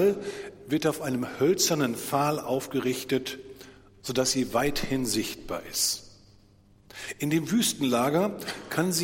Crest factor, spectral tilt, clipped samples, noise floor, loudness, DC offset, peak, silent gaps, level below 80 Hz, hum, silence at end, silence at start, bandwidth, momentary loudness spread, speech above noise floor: 18 dB; -4 dB/octave; under 0.1%; -58 dBFS; -27 LUFS; under 0.1%; -10 dBFS; none; -54 dBFS; none; 0 s; 0 s; 17 kHz; 13 LU; 31 dB